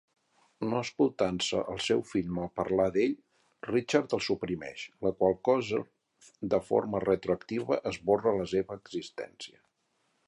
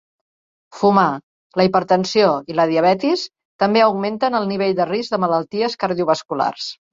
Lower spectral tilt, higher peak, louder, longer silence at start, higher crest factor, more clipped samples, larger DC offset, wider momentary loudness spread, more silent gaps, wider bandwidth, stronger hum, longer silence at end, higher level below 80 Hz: about the same, -5.5 dB/octave vs -5.5 dB/octave; second, -10 dBFS vs -2 dBFS; second, -30 LUFS vs -18 LUFS; second, 0.6 s vs 0.75 s; about the same, 20 dB vs 16 dB; neither; neither; first, 13 LU vs 7 LU; second, none vs 1.23-1.50 s, 3.45-3.59 s; first, 11.5 kHz vs 7.8 kHz; neither; first, 0.8 s vs 0.2 s; about the same, -60 dBFS vs -62 dBFS